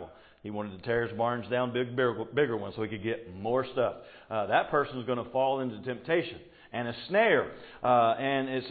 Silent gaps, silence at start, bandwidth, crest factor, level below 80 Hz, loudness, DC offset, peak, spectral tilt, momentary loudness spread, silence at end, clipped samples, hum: none; 0 s; 4.8 kHz; 18 dB; -62 dBFS; -30 LUFS; under 0.1%; -12 dBFS; -9.5 dB/octave; 13 LU; 0 s; under 0.1%; none